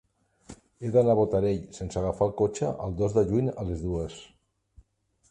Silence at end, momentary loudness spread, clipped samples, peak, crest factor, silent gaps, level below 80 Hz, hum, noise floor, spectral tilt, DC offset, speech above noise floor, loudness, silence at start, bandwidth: 1.05 s; 11 LU; under 0.1%; -10 dBFS; 18 dB; none; -46 dBFS; none; -68 dBFS; -7.5 dB/octave; under 0.1%; 42 dB; -27 LUFS; 0.5 s; 10 kHz